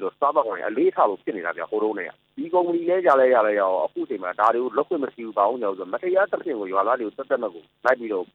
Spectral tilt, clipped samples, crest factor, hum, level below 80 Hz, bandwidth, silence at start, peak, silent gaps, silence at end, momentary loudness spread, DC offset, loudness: -7 dB/octave; under 0.1%; 18 dB; none; -78 dBFS; 6.4 kHz; 0 s; -4 dBFS; none; 0.1 s; 10 LU; under 0.1%; -23 LUFS